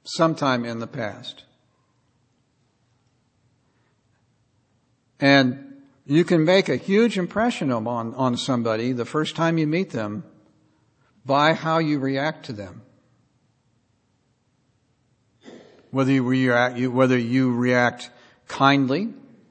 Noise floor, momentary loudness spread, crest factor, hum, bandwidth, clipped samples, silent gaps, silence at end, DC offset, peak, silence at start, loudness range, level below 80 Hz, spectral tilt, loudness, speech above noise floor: -67 dBFS; 16 LU; 22 dB; none; 8.8 kHz; under 0.1%; none; 0.35 s; under 0.1%; -2 dBFS; 0.05 s; 10 LU; -68 dBFS; -6 dB/octave; -21 LUFS; 46 dB